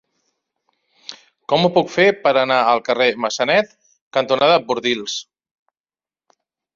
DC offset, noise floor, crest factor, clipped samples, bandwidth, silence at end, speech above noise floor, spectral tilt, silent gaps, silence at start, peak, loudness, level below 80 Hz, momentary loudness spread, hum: under 0.1%; under -90 dBFS; 18 dB; under 0.1%; 7.6 kHz; 1.55 s; over 73 dB; -4 dB/octave; 4.01-4.11 s; 1.1 s; -2 dBFS; -17 LUFS; -64 dBFS; 20 LU; none